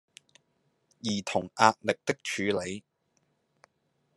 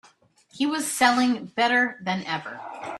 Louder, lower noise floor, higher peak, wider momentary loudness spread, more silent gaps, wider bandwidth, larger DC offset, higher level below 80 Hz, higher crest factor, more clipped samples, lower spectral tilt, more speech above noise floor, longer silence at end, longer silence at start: second, -29 LUFS vs -23 LUFS; first, -75 dBFS vs -58 dBFS; about the same, -4 dBFS vs -4 dBFS; first, 14 LU vs 11 LU; neither; second, 12 kHz vs 13.5 kHz; neither; about the same, -74 dBFS vs -70 dBFS; first, 30 dB vs 22 dB; neither; about the same, -4 dB/octave vs -3 dB/octave; first, 46 dB vs 34 dB; first, 1.35 s vs 0 s; first, 1.05 s vs 0.55 s